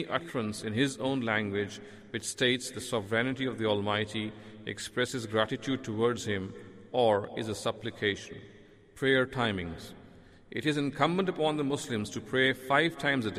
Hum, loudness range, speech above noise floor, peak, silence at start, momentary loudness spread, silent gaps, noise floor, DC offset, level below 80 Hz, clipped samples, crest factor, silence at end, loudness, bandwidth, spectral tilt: none; 2 LU; 23 dB; -12 dBFS; 0 s; 13 LU; none; -54 dBFS; under 0.1%; -62 dBFS; under 0.1%; 20 dB; 0 s; -31 LUFS; 15 kHz; -4.5 dB/octave